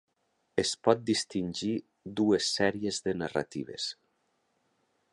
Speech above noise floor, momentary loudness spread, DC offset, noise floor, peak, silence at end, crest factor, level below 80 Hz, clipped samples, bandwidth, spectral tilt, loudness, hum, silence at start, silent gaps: 46 dB; 10 LU; under 0.1%; -76 dBFS; -8 dBFS; 1.2 s; 24 dB; -64 dBFS; under 0.1%; 11.5 kHz; -4 dB/octave; -31 LUFS; none; 0.55 s; none